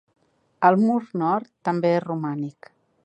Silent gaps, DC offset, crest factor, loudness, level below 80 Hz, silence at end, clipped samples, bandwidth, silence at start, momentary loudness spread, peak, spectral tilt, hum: none; under 0.1%; 20 dB; -23 LUFS; -74 dBFS; 0.55 s; under 0.1%; 8.6 kHz; 0.6 s; 11 LU; -4 dBFS; -8.5 dB/octave; none